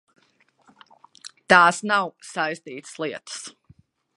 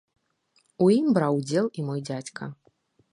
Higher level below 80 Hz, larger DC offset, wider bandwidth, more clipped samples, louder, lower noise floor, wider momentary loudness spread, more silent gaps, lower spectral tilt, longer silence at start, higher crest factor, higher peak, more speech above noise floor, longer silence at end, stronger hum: about the same, -70 dBFS vs -72 dBFS; neither; about the same, 11.5 kHz vs 11 kHz; neither; first, -21 LUFS vs -25 LUFS; second, -63 dBFS vs -68 dBFS; first, 26 LU vs 16 LU; neither; second, -3 dB/octave vs -7 dB/octave; first, 1.25 s vs 0.8 s; first, 24 dB vs 18 dB; first, 0 dBFS vs -8 dBFS; about the same, 41 dB vs 44 dB; about the same, 0.65 s vs 0.6 s; neither